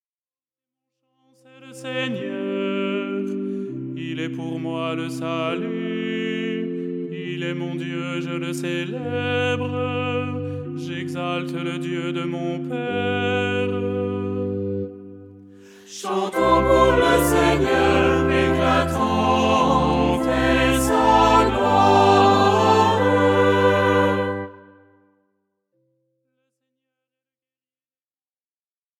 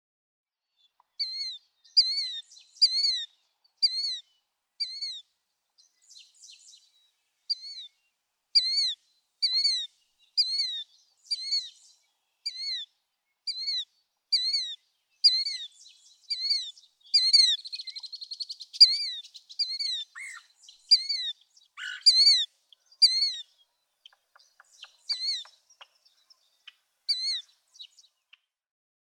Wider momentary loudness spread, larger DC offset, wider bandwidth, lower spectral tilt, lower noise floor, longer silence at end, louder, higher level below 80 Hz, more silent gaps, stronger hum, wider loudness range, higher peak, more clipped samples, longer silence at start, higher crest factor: second, 13 LU vs 21 LU; neither; first, 18 kHz vs 14.5 kHz; first, -5.5 dB/octave vs 9.5 dB/octave; first, under -90 dBFS vs -79 dBFS; first, 4.4 s vs 1.3 s; first, -21 LUFS vs -25 LUFS; first, -40 dBFS vs under -90 dBFS; neither; neither; second, 10 LU vs 13 LU; first, -2 dBFS vs -6 dBFS; neither; first, 1.6 s vs 1.2 s; second, 20 dB vs 26 dB